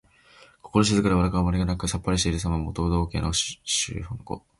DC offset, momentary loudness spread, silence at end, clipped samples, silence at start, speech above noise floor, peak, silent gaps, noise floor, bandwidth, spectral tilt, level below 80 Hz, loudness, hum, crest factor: under 0.1%; 7 LU; 0.2 s; under 0.1%; 0.65 s; 30 dB; -6 dBFS; none; -54 dBFS; 11.5 kHz; -4.5 dB/octave; -36 dBFS; -25 LUFS; none; 20 dB